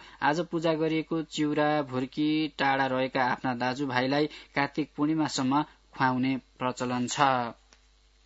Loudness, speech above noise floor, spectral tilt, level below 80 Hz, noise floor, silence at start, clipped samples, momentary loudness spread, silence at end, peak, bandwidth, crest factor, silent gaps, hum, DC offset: -28 LUFS; 34 dB; -5 dB/octave; -64 dBFS; -62 dBFS; 0 s; under 0.1%; 5 LU; 0.75 s; -6 dBFS; 8 kHz; 22 dB; none; none; under 0.1%